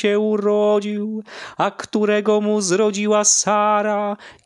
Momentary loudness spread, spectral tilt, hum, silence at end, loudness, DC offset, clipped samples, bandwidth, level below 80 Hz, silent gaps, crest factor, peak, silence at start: 12 LU; -3.5 dB/octave; none; 0.15 s; -18 LUFS; under 0.1%; under 0.1%; 11.5 kHz; -70 dBFS; none; 14 dB; -4 dBFS; 0 s